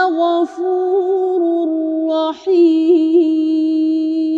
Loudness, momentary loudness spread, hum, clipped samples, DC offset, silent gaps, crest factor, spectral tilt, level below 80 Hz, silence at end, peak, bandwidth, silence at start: -15 LUFS; 6 LU; none; under 0.1%; under 0.1%; none; 10 dB; -5 dB/octave; -70 dBFS; 0 s; -4 dBFS; 5.8 kHz; 0 s